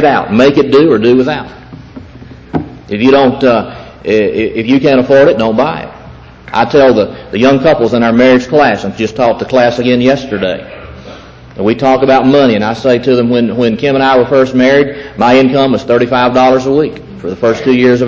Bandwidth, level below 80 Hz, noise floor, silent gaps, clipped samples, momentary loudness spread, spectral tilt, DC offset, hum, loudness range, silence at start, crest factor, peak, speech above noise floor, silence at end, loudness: 7.4 kHz; -40 dBFS; -32 dBFS; none; under 0.1%; 13 LU; -6.5 dB/octave; 0.1%; none; 3 LU; 0 s; 10 dB; 0 dBFS; 24 dB; 0 s; -9 LUFS